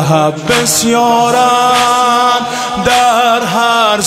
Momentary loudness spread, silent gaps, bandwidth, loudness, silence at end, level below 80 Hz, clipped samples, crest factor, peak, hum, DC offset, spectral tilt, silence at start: 3 LU; none; 16 kHz; -10 LUFS; 0 s; -44 dBFS; under 0.1%; 10 dB; 0 dBFS; none; under 0.1%; -3 dB/octave; 0 s